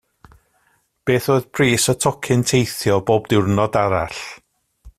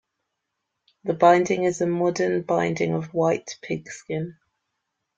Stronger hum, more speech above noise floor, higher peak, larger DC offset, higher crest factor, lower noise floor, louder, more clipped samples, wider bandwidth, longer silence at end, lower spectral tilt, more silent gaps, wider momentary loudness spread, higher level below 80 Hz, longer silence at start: neither; second, 45 dB vs 58 dB; about the same, -2 dBFS vs -2 dBFS; neither; second, 16 dB vs 22 dB; second, -63 dBFS vs -80 dBFS; first, -18 LUFS vs -23 LUFS; neither; first, 15.5 kHz vs 8 kHz; second, 0.1 s vs 0.85 s; about the same, -5 dB/octave vs -6 dB/octave; neither; second, 9 LU vs 14 LU; first, -48 dBFS vs -66 dBFS; about the same, 1.05 s vs 1.05 s